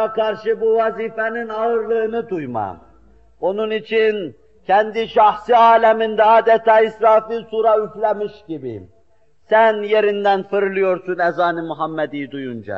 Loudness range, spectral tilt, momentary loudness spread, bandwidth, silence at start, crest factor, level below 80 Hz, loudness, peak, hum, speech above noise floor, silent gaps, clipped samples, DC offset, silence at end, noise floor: 7 LU; -2.5 dB/octave; 14 LU; 6.4 kHz; 0 s; 14 dB; -58 dBFS; -17 LUFS; -2 dBFS; none; 43 dB; none; under 0.1%; 0.2%; 0 s; -60 dBFS